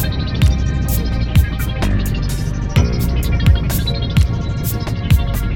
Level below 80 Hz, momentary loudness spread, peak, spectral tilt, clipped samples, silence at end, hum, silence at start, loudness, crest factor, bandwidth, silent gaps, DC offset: -18 dBFS; 5 LU; -2 dBFS; -6 dB/octave; under 0.1%; 0 s; none; 0 s; -17 LUFS; 14 dB; 19 kHz; none; under 0.1%